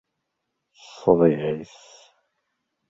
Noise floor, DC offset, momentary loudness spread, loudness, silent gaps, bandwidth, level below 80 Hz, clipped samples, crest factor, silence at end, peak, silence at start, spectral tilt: -79 dBFS; under 0.1%; 16 LU; -21 LUFS; none; 7.8 kHz; -60 dBFS; under 0.1%; 24 dB; 1.25 s; -2 dBFS; 0.95 s; -8 dB/octave